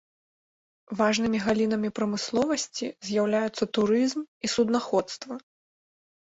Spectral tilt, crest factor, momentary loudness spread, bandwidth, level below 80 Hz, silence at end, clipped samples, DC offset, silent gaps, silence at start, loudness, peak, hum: -4.5 dB/octave; 16 dB; 10 LU; 8 kHz; -64 dBFS; 0.8 s; under 0.1%; under 0.1%; 4.28-4.41 s; 0.9 s; -26 LUFS; -10 dBFS; none